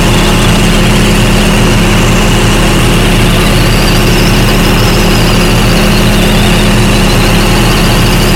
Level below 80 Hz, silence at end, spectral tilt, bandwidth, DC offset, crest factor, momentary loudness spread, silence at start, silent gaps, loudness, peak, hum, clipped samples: -12 dBFS; 0 s; -4.5 dB/octave; 17 kHz; under 0.1%; 6 dB; 0 LU; 0 s; none; -7 LUFS; 0 dBFS; none; 0.2%